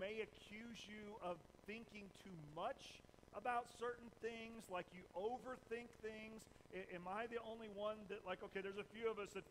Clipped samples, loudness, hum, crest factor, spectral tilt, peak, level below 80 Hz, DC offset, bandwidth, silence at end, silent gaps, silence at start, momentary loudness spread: under 0.1%; -51 LUFS; none; 20 dB; -4.5 dB/octave; -32 dBFS; -76 dBFS; under 0.1%; 15.5 kHz; 0 s; none; 0 s; 10 LU